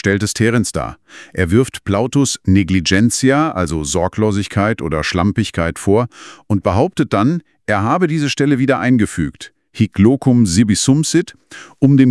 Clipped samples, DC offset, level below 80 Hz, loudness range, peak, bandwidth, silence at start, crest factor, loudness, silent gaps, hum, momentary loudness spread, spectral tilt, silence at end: under 0.1%; under 0.1%; -42 dBFS; 3 LU; 0 dBFS; 12 kHz; 0.05 s; 14 dB; -15 LUFS; none; none; 8 LU; -5.5 dB/octave; 0 s